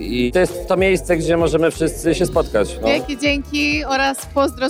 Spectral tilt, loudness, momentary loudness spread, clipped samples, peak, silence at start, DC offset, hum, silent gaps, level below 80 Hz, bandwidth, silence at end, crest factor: -5 dB/octave; -18 LUFS; 3 LU; under 0.1%; -2 dBFS; 0 s; under 0.1%; none; none; -32 dBFS; over 20 kHz; 0 s; 14 dB